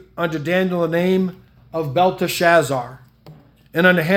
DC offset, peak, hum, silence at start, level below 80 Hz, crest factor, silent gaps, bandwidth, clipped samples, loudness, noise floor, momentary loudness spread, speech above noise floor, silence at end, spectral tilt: under 0.1%; 0 dBFS; none; 0.15 s; -56 dBFS; 18 dB; none; 17 kHz; under 0.1%; -18 LUFS; -45 dBFS; 11 LU; 28 dB; 0 s; -5.5 dB/octave